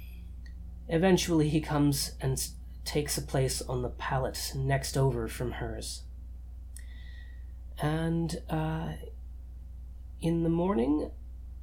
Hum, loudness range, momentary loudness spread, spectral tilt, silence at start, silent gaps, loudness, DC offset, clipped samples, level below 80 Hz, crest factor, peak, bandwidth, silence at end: none; 6 LU; 19 LU; -5.5 dB/octave; 0 s; none; -31 LUFS; under 0.1%; under 0.1%; -42 dBFS; 20 dB; -12 dBFS; 18.5 kHz; 0 s